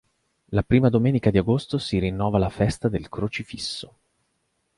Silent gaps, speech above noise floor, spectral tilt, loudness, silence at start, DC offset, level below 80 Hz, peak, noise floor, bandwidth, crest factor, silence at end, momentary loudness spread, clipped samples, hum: none; 50 dB; -7 dB/octave; -23 LUFS; 0.5 s; under 0.1%; -42 dBFS; -6 dBFS; -73 dBFS; 11.5 kHz; 18 dB; 0.9 s; 11 LU; under 0.1%; none